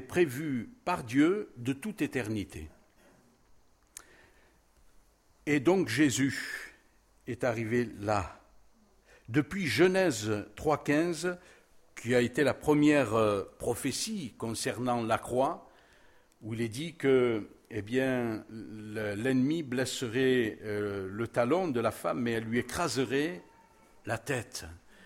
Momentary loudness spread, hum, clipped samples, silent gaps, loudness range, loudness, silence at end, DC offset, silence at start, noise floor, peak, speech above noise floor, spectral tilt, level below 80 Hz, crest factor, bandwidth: 16 LU; none; under 0.1%; none; 6 LU; -31 LUFS; 0.3 s; under 0.1%; 0 s; -64 dBFS; -12 dBFS; 34 dB; -5 dB/octave; -60 dBFS; 20 dB; 16.5 kHz